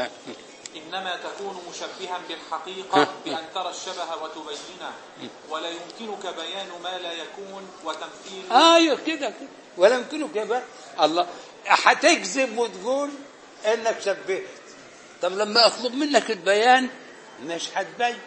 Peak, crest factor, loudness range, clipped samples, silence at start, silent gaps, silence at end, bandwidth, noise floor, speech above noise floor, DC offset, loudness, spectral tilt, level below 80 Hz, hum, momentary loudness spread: 0 dBFS; 24 dB; 11 LU; under 0.1%; 0 s; none; 0 s; 8.8 kHz; -46 dBFS; 22 dB; under 0.1%; -23 LUFS; -2 dB/octave; -80 dBFS; none; 21 LU